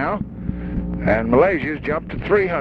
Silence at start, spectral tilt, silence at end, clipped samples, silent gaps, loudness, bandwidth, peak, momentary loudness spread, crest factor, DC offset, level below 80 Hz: 0 s; -9.5 dB/octave; 0 s; under 0.1%; none; -20 LUFS; 6 kHz; -2 dBFS; 11 LU; 18 dB; under 0.1%; -34 dBFS